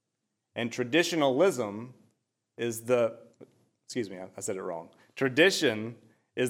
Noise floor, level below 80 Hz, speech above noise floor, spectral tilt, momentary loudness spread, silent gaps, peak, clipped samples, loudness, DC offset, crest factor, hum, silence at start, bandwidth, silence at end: -83 dBFS; -88 dBFS; 55 dB; -4 dB/octave; 18 LU; none; -8 dBFS; under 0.1%; -29 LUFS; under 0.1%; 22 dB; none; 0.55 s; 16 kHz; 0 s